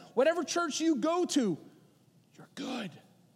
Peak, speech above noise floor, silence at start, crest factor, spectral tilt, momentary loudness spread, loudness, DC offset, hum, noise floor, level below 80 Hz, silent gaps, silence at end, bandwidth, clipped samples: -14 dBFS; 33 dB; 0 s; 18 dB; -4 dB/octave; 14 LU; -31 LUFS; under 0.1%; none; -64 dBFS; under -90 dBFS; none; 0.35 s; 14.5 kHz; under 0.1%